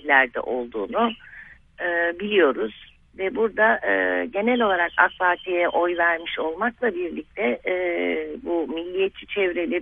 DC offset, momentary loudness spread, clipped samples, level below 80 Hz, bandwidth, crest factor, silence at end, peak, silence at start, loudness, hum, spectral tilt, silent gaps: under 0.1%; 9 LU; under 0.1%; -56 dBFS; 3.9 kHz; 22 dB; 0 s; -2 dBFS; 0.05 s; -23 LUFS; none; -7.5 dB/octave; none